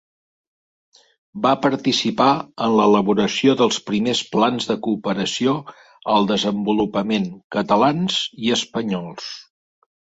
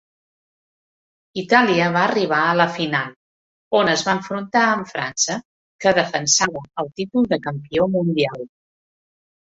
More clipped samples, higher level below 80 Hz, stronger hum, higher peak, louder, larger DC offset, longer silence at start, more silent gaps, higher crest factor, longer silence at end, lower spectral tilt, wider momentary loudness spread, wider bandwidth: neither; about the same, -58 dBFS vs -58 dBFS; neither; about the same, -2 dBFS vs -2 dBFS; about the same, -19 LUFS vs -19 LUFS; neither; about the same, 1.35 s vs 1.35 s; second, 7.44-7.50 s vs 3.16-3.71 s, 5.45-5.79 s; about the same, 18 dB vs 20 dB; second, 0.65 s vs 1.05 s; first, -5 dB/octave vs -3.5 dB/octave; second, 9 LU vs 12 LU; about the same, 8 kHz vs 8.2 kHz